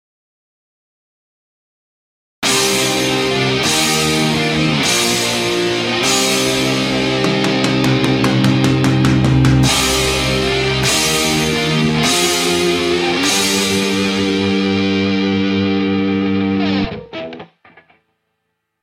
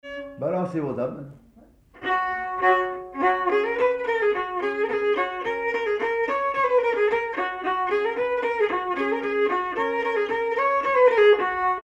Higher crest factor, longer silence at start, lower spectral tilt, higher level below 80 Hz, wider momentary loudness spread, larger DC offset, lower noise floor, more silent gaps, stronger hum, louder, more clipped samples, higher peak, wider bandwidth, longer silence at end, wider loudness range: about the same, 16 dB vs 16 dB; first, 2.4 s vs 0.05 s; second, -4 dB/octave vs -6 dB/octave; first, -36 dBFS vs -58 dBFS; second, 4 LU vs 8 LU; neither; first, -72 dBFS vs -54 dBFS; neither; neither; first, -14 LUFS vs -23 LUFS; neither; first, 0 dBFS vs -8 dBFS; first, 16.5 kHz vs 7.6 kHz; first, 1.35 s vs 0.05 s; about the same, 4 LU vs 3 LU